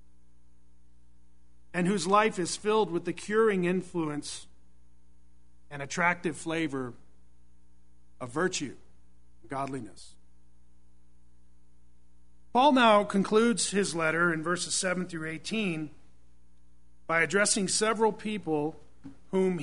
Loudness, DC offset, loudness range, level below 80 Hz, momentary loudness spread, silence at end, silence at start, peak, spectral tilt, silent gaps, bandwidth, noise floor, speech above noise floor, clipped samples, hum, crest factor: -28 LUFS; 0.5%; 12 LU; -62 dBFS; 13 LU; 0 s; 1.75 s; -8 dBFS; -4 dB/octave; none; 11 kHz; -64 dBFS; 36 dB; under 0.1%; none; 22 dB